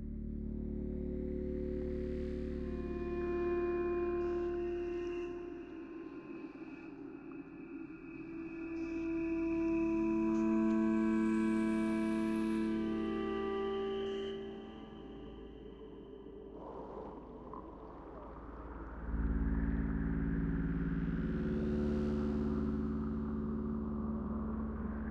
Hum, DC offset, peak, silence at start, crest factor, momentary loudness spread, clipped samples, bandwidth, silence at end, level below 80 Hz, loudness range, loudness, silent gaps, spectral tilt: none; under 0.1%; -24 dBFS; 0 s; 12 dB; 16 LU; under 0.1%; 10.5 kHz; 0 s; -46 dBFS; 14 LU; -37 LUFS; none; -8.5 dB/octave